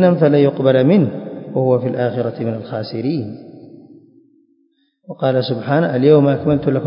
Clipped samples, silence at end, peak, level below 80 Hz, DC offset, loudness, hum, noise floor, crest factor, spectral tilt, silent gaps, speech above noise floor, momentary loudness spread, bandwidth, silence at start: under 0.1%; 0 s; 0 dBFS; -52 dBFS; under 0.1%; -16 LUFS; none; -61 dBFS; 16 dB; -13 dB/octave; none; 46 dB; 13 LU; 5.4 kHz; 0 s